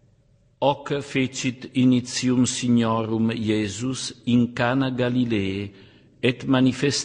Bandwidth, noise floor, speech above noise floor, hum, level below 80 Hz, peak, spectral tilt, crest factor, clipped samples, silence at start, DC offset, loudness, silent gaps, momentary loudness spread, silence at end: 10 kHz; -59 dBFS; 37 dB; none; -56 dBFS; -4 dBFS; -5 dB/octave; 18 dB; under 0.1%; 0.6 s; under 0.1%; -23 LUFS; none; 7 LU; 0 s